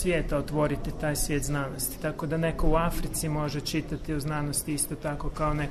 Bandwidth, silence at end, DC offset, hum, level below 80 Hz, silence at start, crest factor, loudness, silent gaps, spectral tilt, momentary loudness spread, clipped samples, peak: 13.5 kHz; 0 s; under 0.1%; none; -34 dBFS; 0 s; 16 dB; -29 LUFS; none; -5 dB/octave; 5 LU; under 0.1%; -12 dBFS